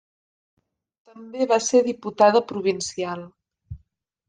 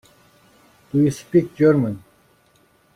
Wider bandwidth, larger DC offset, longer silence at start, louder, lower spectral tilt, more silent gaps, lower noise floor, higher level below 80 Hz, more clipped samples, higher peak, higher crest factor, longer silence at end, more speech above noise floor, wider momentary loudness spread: second, 10 kHz vs 14 kHz; neither; first, 1.15 s vs 0.95 s; about the same, -21 LUFS vs -19 LUFS; second, -4 dB/octave vs -8 dB/octave; neither; first, -67 dBFS vs -58 dBFS; about the same, -58 dBFS vs -56 dBFS; neither; about the same, -4 dBFS vs -4 dBFS; about the same, 20 dB vs 18 dB; second, 0.5 s vs 0.95 s; first, 45 dB vs 40 dB; first, 13 LU vs 10 LU